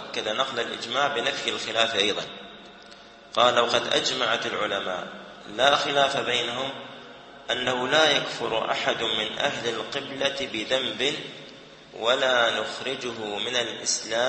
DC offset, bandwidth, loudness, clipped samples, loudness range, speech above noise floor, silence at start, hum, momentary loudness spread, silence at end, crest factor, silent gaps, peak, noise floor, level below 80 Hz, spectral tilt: under 0.1%; 8.8 kHz; -24 LUFS; under 0.1%; 3 LU; 22 dB; 0 s; none; 18 LU; 0 s; 22 dB; none; -4 dBFS; -48 dBFS; -64 dBFS; -2 dB/octave